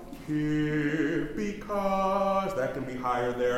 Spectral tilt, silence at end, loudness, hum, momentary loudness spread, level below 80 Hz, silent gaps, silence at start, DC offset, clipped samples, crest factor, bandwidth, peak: -6.5 dB/octave; 0 s; -29 LUFS; none; 6 LU; -48 dBFS; none; 0 s; under 0.1%; under 0.1%; 14 dB; 15.5 kHz; -16 dBFS